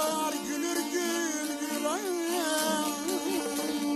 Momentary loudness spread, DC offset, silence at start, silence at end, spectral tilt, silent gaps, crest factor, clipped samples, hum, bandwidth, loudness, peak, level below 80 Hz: 4 LU; under 0.1%; 0 s; 0 s; -2 dB/octave; none; 14 dB; under 0.1%; none; 13.5 kHz; -30 LUFS; -16 dBFS; -72 dBFS